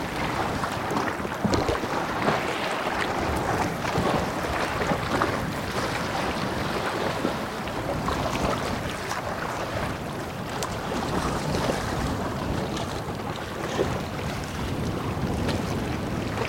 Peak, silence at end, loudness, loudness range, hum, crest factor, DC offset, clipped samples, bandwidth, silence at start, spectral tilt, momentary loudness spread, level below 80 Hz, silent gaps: -6 dBFS; 0 s; -28 LUFS; 3 LU; none; 20 dB; under 0.1%; under 0.1%; 16.5 kHz; 0 s; -5 dB/octave; 5 LU; -42 dBFS; none